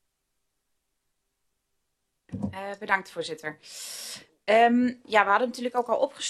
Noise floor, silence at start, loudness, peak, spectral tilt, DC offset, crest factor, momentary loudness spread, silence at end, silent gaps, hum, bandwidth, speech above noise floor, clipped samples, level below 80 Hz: -78 dBFS; 2.3 s; -25 LUFS; -6 dBFS; -4 dB/octave; under 0.1%; 24 dB; 16 LU; 0 s; none; none; 13 kHz; 52 dB; under 0.1%; -70 dBFS